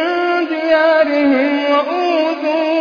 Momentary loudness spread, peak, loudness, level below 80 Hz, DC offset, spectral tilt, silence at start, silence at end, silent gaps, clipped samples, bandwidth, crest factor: 5 LU; -2 dBFS; -14 LUFS; -62 dBFS; under 0.1%; -4 dB/octave; 0 s; 0 s; none; under 0.1%; 5.2 kHz; 12 dB